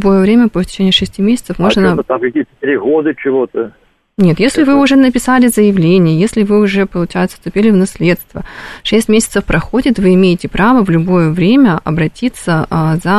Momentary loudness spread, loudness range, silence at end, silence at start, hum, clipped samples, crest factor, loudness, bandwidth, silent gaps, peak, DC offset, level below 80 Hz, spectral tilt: 8 LU; 3 LU; 0 s; 0 s; none; under 0.1%; 10 dB; -11 LUFS; 13.5 kHz; none; 0 dBFS; 0.7%; -34 dBFS; -6 dB/octave